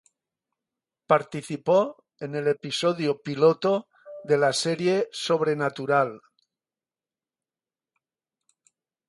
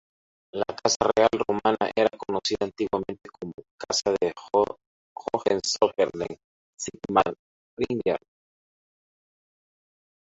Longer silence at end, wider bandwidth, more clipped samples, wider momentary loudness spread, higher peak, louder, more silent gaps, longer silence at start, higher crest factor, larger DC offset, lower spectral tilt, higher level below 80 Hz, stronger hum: first, 2.9 s vs 2.1 s; first, 11.5 kHz vs 8 kHz; neither; second, 10 LU vs 16 LU; about the same, -6 dBFS vs -4 dBFS; about the same, -25 LUFS vs -26 LUFS; second, none vs 0.96-1.00 s, 3.54-3.58 s, 3.71-3.78 s, 4.86-5.16 s, 6.44-6.73 s, 7.39-7.77 s; first, 1.1 s vs 0.55 s; about the same, 22 dB vs 22 dB; neither; first, -5 dB/octave vs -3.5 dB/octave; second, -76 dBFS vs -60 dBFS; neither